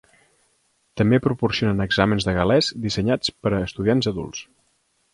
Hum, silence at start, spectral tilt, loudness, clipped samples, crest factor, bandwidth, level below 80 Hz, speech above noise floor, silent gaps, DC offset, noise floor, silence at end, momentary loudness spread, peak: none; 0.95 s; -6 dB/octave; -21 LUFS; under 0.1%; 20 dB; 11.5 kHz; -44 dBFS; 46 dB; none; under 0.1%; -67 dBFS; 0.7 s; 9 LU; -2 dBFS